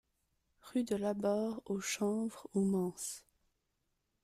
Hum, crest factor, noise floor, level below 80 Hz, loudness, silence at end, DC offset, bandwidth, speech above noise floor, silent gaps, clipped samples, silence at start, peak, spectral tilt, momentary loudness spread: none; 16 dB; -83 dBFS; -72 dBFS; -37 LUFS; 1.05 s; under 0.1%; 15.5 kHz; 47 dB; none; under 0.1%; 0.65 s; -22 dBFS; -5 dB/octave; 7 LU